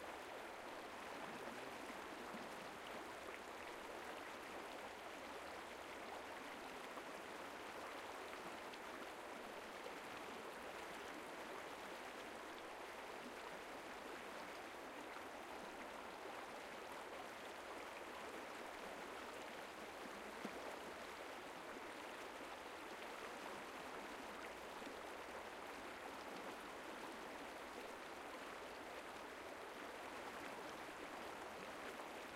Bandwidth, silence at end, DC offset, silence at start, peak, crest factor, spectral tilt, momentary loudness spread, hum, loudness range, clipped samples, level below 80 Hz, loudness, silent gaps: 16 kHz; 0 s; under 0.1%; 0 s; -34 dBFS; 18 dB; -2.5 dB/octave; 1 LU; none; 1 LU; under 0.1%; -78 dBFS; -52 LUFS; none